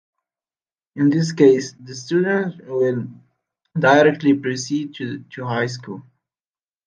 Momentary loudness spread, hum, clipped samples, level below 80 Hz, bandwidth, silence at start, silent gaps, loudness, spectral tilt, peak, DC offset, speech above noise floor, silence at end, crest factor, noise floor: 18 LU; none; under 0.1%; -68 dBFS; 9.6 kHz; 0.95 s; none; -19 LUFS; -6 dB/octave; -2 dBFS; under 0.1%; over 71 dB; 0.85 s; 20 dB; under -90 dBFS